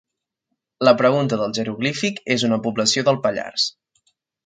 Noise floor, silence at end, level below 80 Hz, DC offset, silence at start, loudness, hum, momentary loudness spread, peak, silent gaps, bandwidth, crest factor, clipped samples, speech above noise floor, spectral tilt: -78 dBFS; 0.75 s; -64 dBFS; under 0.1%; 0.8 s; -20 LUFS; none; 7 LU; 0 dBFS; none; 9.6 kHz; 20 dB; under 0.1%; 59 dB; -4 dB/octave